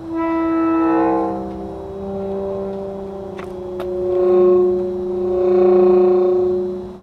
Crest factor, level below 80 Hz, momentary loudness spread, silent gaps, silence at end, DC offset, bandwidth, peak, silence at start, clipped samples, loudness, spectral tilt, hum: 14 dB; -44 dBFS; 16 LU; none; 0 s; under 0.1%; 4.5 kHz; -4 dBFS; 0 s; under 0.1%; -17 LUFS; -9.5 dB/octave; none